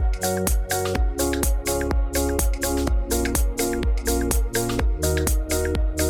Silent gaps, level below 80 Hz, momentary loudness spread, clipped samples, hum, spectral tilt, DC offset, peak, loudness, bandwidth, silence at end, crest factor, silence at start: none; -24 dBFS; 2 LU; under 0.1%; none; -4.5 dB/octave; under 0.1%; -6 dBFS; -23 LUFS; 18 kHz; 0 s; 16 dB; 0 s